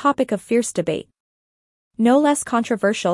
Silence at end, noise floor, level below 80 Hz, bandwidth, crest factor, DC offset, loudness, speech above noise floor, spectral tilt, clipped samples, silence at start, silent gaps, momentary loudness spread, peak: 0 s; under -90 dBFS; -62 dBFS; 12 kHz; 16 dB; under 0.1%; -20 LUFS; over 71 dB; -4.5 dB/octave; under 0.1%; 0 s; 1.20-1.91 s; 8 LU; -4 dBFS